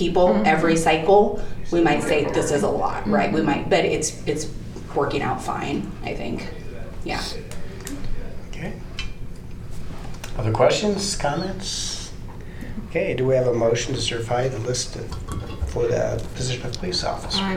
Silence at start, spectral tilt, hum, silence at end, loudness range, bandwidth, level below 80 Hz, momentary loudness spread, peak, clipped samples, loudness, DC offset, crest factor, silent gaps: 0 s; -4.5 dB/octave; none; 0 s; 12 LU; 15.5 kHz; -34 dBFS; 18 LU; -4 dBFS; under 0.1%; -22 LUFS; under 0.1%; 18 dB; none